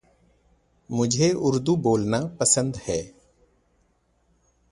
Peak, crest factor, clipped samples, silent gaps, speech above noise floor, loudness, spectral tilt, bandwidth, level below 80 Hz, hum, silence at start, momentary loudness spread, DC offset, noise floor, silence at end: -4 dBFS; 22 dB; under 0.1%; none; 44 dB; -23 LUFS; -4.5 dB/octave; 11.5 kHz; -54 dBFS; none; 0.9 s; 10 LU; under 0.1%; -66 dBFS; 1.65 s